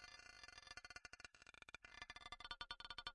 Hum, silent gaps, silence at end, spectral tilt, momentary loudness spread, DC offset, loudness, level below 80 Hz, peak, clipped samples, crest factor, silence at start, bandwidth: none; none; 0 s; -1 dB/octave; 8 LU; under 0.1%; -56 LUFS; -72 dBFS; -34 dBFS; under 0.1%; 24 dB; 0 s; 12 kHz